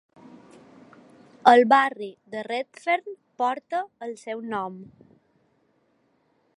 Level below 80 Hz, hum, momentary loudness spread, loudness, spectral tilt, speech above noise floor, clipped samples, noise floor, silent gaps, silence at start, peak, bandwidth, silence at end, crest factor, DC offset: -78 dBFS; none; 20 LU; -24 LUFS; -4.5 dB/octave; 44 dB; under 0.1%; -67 dBFS; none; 1.45 s; -2 dBFS; 11 kHz; 1.75 s; 26 dB; under 0.1%